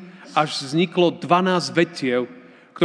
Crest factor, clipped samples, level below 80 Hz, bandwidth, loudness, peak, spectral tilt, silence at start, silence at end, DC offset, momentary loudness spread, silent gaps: 20 dB; under 0.1%; -78 dBFS; 10 kHz; -21 LUFS; -2 dBFS; -5.5 dB/octave; 0 s; 0 s; under 0.1%; 7 LU; none